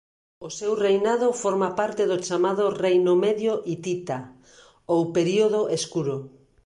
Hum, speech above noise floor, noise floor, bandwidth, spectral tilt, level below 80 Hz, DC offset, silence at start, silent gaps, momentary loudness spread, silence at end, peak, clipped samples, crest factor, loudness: none; 31 dB; -54 dBFS; 11.5 kHz; -5 dB/octave; -66 dBFS; under 0.1%; 0.4 s; none; 9 LU; 0.4 s; -10 dBFS; under 0.1%; 14 dB; -24 LUFS